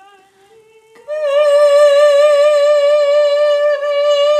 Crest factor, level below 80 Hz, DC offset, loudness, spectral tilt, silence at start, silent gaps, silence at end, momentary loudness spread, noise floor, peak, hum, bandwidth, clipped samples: 10 dB; -78 dBFS; under 0.1%; -11 LUFS; 1.5 dB/octave; 1.1 s; none; 0 s; 6 LU; -47 dBFS; -2 dBFS; none; 9.6 kHz; under 0.1%